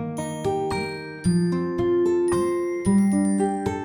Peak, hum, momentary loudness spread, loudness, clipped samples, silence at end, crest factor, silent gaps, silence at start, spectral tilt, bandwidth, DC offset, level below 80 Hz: -10 dBFS; none; 7 LU; -23 LUFS; under 0.1%; 0 s; 12 dB; none; 0 s; -7 dB/octave; 18 kHz; under 0.1%; -48 dBFS